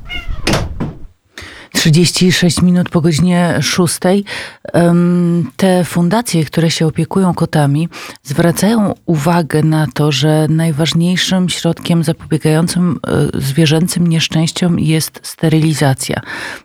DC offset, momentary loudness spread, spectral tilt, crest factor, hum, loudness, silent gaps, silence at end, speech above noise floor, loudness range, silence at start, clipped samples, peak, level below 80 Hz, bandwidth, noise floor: under 0.1%; 8 LU; -5.5 dB/octave; 12 dB; none; -13 LUFS; none; 0.05 s; 22 dB; 2 LU; 0 s; under 0.1%; 0 dBFS; -36 dBFS; 16 kHz; -34 dBFS